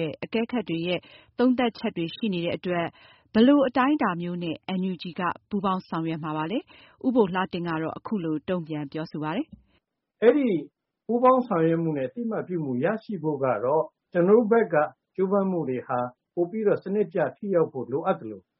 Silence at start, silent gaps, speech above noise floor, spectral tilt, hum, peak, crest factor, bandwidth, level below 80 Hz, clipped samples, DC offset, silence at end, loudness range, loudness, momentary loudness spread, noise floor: 0 s; none; 46 dB; -5.5 dB/octave; none; -6 dBFS; 18 dB; 5.8 kHz; -66 dBFS; under 0.1%; under 0.1%; 0.2 s; 4 LU; -26 LUFS; 10 LU; -71 dBFS